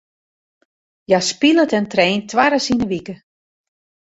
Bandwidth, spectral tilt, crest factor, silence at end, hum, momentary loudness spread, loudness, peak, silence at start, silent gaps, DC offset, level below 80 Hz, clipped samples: 8.2 kHz; -4 dB/octave; 18 dB; 0.9 s; none; 8 LU; -16 LUFS; 0 dBFS; 1.1 s; none; under 0.1%; -52 dBFS; under 0.1%